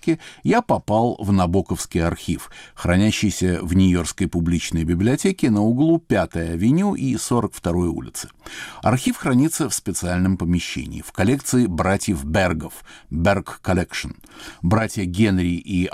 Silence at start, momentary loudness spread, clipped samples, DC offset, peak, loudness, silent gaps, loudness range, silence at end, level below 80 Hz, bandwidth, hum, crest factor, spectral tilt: 0.05 s; 11 LU; under 0.1%; under 0.1%; -8 dBFS; -21 LUFS; none; 3 LU; 0.05 s; -40 dBFS; 16 kHz; none; 12 dB; -5.5 dB/octave